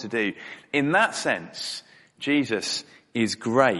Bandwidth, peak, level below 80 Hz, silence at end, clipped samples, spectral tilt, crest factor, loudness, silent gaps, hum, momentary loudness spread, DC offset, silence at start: 11.5 kHz; -4 dBFS; -68 dBFS; 0 s; under 0.1%; -4 dB/octave; 22 dB; -25 LUFS; none; none; 12 LU; under 0.1%; 0 s